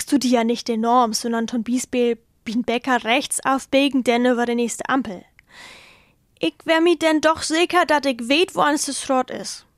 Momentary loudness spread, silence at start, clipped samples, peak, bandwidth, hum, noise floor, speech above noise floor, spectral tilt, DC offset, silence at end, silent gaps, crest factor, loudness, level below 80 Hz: 8 LU; 0 s; under 0.1%; -4 dBFS; 14.5 kHz; none; -55 dBFS; 35 dB; -3 dB/octave; under 0.1%; 0.2 s; none; 18 dB; -20 LUFS; -60 dBFS